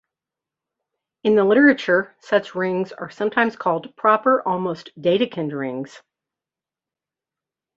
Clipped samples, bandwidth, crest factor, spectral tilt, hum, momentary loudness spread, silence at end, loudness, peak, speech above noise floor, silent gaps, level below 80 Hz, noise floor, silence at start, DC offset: under 0.1%; 7.6 kHz; 20 dB; -6.5 dB/octave; none; 13 LU; 1.8 s; -20 LUFS; -2 dBFS; 69 dB; none; -68 dBFS; -89 dBFS; 1.25 s; under 0.1%